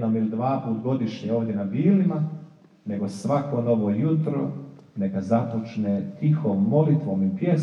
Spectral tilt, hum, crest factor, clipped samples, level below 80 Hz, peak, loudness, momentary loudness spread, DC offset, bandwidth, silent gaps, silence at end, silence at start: -9.5 dB/octave; none; 16 dB; under 0.1%; -76 dBFS; -8 dBFS; -24 LUFS; 9 LU; under 0.1%; 10 kHz; none; 0 s; 0 s